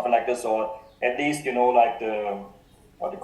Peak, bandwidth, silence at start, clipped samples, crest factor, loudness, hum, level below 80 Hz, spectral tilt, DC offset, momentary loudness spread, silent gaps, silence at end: -8 dBFS; 12.5 kHz; 0 s; under 0.1%; 18 dB; -24 LUFS; none; -60 dBFS; -4.5 dB/octave; under 0.1%; 13 LU; none; 0 s